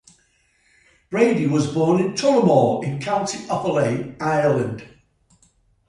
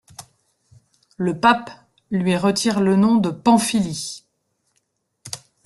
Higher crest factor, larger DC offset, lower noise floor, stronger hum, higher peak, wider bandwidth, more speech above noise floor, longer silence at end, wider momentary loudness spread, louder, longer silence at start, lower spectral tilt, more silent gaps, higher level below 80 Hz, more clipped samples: about the same, 18 dB vs 20 dB; neither; second, -62 dBFS vs -71 dBFS; neither; about the same, -4 dBFS vs -2 dBFS; about the same, 11.5 kHz vs 12.5 kHz; second, 43 dB vs 53 dB; first, 1 s vs 0.3 s; second, 9 LU vs 18 LU; about the same, -20 LUFS vs -19 LUFS; first, 1.1 s vs 0.2 s; about the same, -6 dB/octave vs -5 dB/octave; neither; about the same, -58 dBFS vs -58 dBFS; neither